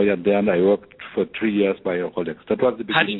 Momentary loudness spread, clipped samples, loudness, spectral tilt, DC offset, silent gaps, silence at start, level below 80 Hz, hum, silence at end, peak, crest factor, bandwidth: 8 LU; under 0.1%; -21 LUFS; -9 dB/octave; under 0.1%; none; 0 s; -56 dBFS; none; 0 s; 0 dBFS; 20 dB; 4.1 kHz